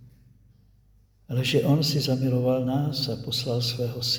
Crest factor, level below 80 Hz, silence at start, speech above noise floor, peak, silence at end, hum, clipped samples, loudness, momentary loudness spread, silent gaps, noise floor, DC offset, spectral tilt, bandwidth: 16 dB; -56 dBFS; 0 s; 35 dB; -10 dBFS; 0 s; none; under 0.1%; -25 LUFS; 6 LU; none; -59 dBFS; under 0.1%; -5.5 dB/octave; over 20 kHz